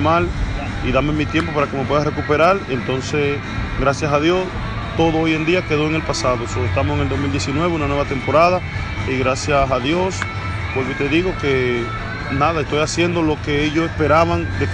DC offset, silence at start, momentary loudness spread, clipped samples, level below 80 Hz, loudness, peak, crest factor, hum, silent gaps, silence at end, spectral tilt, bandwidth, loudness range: under 0.1%; 0 s; 8 LU; under 0.1%; -32 dBFS; -18 LUFS; -4 dBFS; 14 dB; none; none; 0 s; -5.5 dB/octave; 10 kHz; 1 LU